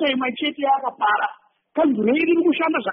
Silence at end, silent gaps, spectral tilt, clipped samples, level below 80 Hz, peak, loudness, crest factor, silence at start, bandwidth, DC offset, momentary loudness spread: 0 s; none; -2 dB/octave; under 0.1%; -66 dBFS; -8 dBFS; -20 LUFS; 12 dB; 0 s; 4.2 kHz; under 0.1%; 5 LU